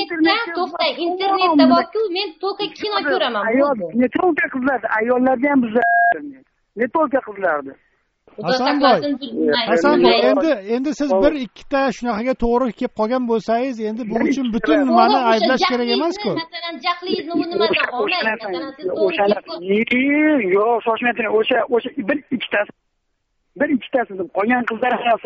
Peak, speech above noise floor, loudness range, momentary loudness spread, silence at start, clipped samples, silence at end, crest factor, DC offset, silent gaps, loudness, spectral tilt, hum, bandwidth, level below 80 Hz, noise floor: 0 dBFS; 52 dB; 3 LU; 9 LU; 0 s; under 0.1%; 0.05 s; 18 dB; under 0.1%; none; -18 LUFS; -2 dB/octave; none; 7.8 kHz; -46 dBFS; -70 dBFS